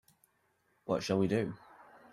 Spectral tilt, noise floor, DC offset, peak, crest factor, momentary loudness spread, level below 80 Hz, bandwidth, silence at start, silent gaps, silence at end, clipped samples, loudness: -6.5 dB/octave; -75 dBFS; under 0.1%; -18 dBFS; 18 dB; 19 LU; -70 dBFS; 13.5 kHz; 0.85 s; none; 0.55 s; under 0.1%; -33 LUFS